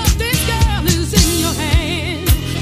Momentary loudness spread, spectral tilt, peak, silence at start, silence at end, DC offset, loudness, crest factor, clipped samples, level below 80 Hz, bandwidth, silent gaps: 4 LU; -4 dB/octave; 0 dBFS; 0 s; 0 s; 0.4%; -15 LUFS; 14 dB; under 0.1%; -20 dBFS; 15.5 kHz; none